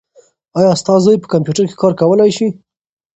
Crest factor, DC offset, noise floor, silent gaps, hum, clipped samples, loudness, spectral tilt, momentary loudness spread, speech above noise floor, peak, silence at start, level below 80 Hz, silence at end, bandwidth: 14 dB; under 0.1%; -50 dBFS; none; none; under 0.1%; -13 LUFS; -6.5 dB/octave; 7 LU; 38 dB; 0 dBFS; 0.55 s; -54 dBFS; 0.65 s; 8.8 kHz